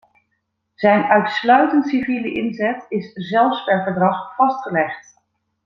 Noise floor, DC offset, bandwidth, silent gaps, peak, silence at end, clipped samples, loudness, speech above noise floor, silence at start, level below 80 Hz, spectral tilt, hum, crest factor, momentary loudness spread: -72 dBFS; under 0.1%; 7.2 kHz; none; -2 dBFS; 0.65 s; under 0.1%; -18 LUFS; 54 dB; 0.8 s; -62 dBFS; -7 dB/octave; none; 18 dB; 10 LU